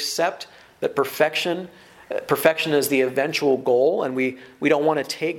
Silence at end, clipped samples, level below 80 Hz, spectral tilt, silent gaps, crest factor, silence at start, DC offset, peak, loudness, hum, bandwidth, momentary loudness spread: 0 s; under 0.1%; -68 dBFS; -4 dB/octave; none; 22 dB; 0 s; under 0.1%; 0 dBFS; -22 LUFS; none; 17.5 kHz; 11 LU